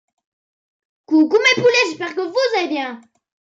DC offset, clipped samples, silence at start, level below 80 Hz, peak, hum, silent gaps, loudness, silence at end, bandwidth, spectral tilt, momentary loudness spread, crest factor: under 0.1%; under 0.1%; 1.1 s; -76 dBFS; -4 dBFS; none; none; -16 LUFS; 0.5 s; 7.8 kHz; -3.5 dB/octave; 11 LU; 16 dB